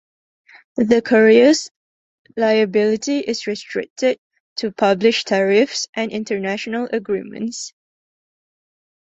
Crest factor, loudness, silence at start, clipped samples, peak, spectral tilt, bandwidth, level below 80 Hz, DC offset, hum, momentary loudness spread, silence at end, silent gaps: 18 dB; -18 LUFS; 0.75 s; under 0.1%; -2 dBFS; -4 dB/octave; 8.2 kHz; -62 dBFS; under 0.1%; none; 15 LU; 1.35 s; 1.71-2.25 s, 3.90-3.96 s, 4.18-4.30 s, 4.40-4.56 s, 5.89-5.93 s